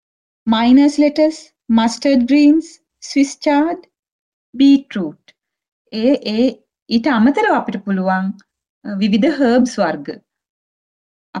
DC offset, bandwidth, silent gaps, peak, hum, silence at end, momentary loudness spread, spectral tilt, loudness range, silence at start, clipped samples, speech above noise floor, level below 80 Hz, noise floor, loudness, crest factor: under 0.1%; 10 kHz; 3.99-4.03 s, 4.12-4.53 s, 5.68-5.85 s, 6.82-6.86 s, 8.69-8.82 s, 10.49-11.33 s; -2 dBFS; none; 0 s; 16 LU; -5.5 dB/octave; 4 LU; 0.45 s; under 0.1%; over 76 dB; -54 dBFS; under -90 dBFS; -15 LUFS; 14 dB